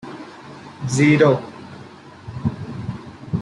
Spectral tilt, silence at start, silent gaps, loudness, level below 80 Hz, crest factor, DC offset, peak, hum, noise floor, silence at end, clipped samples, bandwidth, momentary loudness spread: -6.5 dB/octave; 0.05 s; none; -19 LUFS; -52 dBFS; 18 dB; under 0.1%; -2 dBFS; none; -41 dBFS; 0 s; under 0.1%; 11.5 kHz; 24 LU